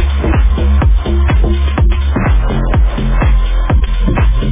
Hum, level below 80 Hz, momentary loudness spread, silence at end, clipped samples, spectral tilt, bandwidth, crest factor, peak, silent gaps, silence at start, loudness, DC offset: none; -10 dBFS; 2 LU; 0 s; under 0.1%; -11 dB/octave; 3.8 kHz; 8 dB; -2 dBFS; none; 0 s; -13 LUFS; under 0.1%